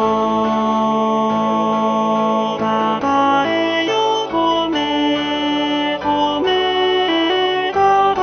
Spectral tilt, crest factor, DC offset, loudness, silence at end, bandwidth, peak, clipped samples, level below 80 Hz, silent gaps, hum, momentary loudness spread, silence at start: -4.5 dB/octave; 12 dB; under 0.1%; -16 LUFS; 0 s; 6.6 kHz; -4 dBFS; under 0.1%; -50 dBFS; none; none; 3 LU; 0 s